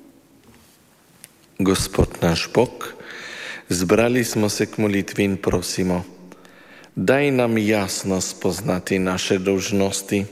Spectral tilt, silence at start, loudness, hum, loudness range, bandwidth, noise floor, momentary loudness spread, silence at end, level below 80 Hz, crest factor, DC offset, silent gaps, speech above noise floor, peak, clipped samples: -4.5 dB/octave; 1.6 s; -21 LUFS; none; 3 LU; 16 kHz; -54 dBFS; 14 LU; 0 s; -42 dBFS; 18 dB; under 0.1%; none; 33 dB; -4 dBFS; under 0.1%